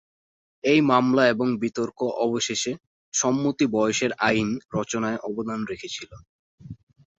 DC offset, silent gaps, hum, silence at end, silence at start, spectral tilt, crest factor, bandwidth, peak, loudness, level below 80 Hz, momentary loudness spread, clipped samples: under 0.1%; 2.87-3.12 s, 6.29-6.58 s; none; 0.45 s; 0.65 s; -4 dB/octave; 20 dB; 8.2 kHz; -4 dBFS; -24 LUFS; -60 dBFS; 15 LU; under 0.1%